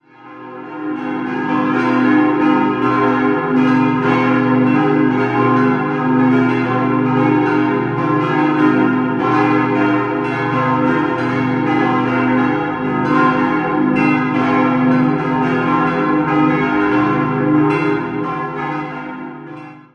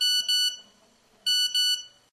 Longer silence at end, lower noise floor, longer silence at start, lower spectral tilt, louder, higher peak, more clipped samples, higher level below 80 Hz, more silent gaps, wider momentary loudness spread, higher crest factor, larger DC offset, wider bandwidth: about the same, 0.15 s vs 0.25 s; second, -36 dBFS vs -61 dBFS; first, 0.2 s vs 0 s; first, -8.5 dB/octave vs 4.5 dB/octave; first, -15 LUFS vs -23 LUFS; first, -2 dBFS vs -16 dBFS; neither; first, -50 dBFS vs -78 dBFS; neither; about the same, 8 LU vs 9 LU; about the same, 14 dB vs 12 dB; neither; second, 6.6 kHz vs 12.5 kHz